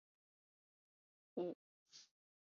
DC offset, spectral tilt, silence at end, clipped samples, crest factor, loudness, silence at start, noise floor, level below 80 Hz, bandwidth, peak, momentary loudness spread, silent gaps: under 0.1%; -6 dB/octave; 0.5 s; under 0.1%; 22 dB; -49 LUFS; 1.35 s; under -90 dBFS; under -90 dBFS; 7.2 kHz; -32 dBFS; 17 LU; 1.55-1.86 s